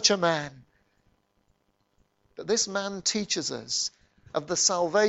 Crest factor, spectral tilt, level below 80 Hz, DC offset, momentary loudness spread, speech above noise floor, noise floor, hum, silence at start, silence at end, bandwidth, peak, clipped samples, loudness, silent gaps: 22 dB; -2 dB/octave; -68 dBFS; under 0.1%; 12 LU; 44 dB; -71 dBFS; none; 0 s; 0 s; 8.4 kHz; -6 dBFS; under 0.1%; -27 LUFS; none